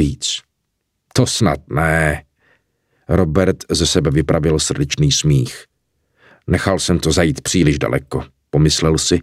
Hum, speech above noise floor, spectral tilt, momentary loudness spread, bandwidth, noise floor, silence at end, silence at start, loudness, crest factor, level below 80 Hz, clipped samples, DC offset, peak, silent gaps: none; 56 dB; -4.5 dB/octave; 7 LU; 15 kHz; -72 dBFS; 0 s; 0 s; -16 LUFS; 16 dB; -32 dBFS; under 0.1%; under 0.1%; 0 dBFS; none